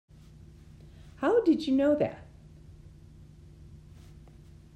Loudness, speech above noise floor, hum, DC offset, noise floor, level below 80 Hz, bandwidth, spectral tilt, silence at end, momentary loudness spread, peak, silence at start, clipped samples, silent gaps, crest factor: -27 LUFS; 27 dB; none; under 0.1%; -52 dBFS; -56 dBFS; 9.2 kHz; -7 dB/octave; 1 s; 27 LU; -14 dBFS; 1.05 s; under 0.1%; none; 18 dB